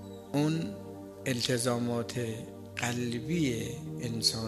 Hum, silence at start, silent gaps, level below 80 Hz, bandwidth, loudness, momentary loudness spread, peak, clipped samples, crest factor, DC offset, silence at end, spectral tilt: none; 0 s; none; -60 dBFS; 15 kHz; -32 LUFS; 11 LU; -12 dBFS; under 0.1%; 22 dB; under 0.1%; 0 s; -4.5 dB/octave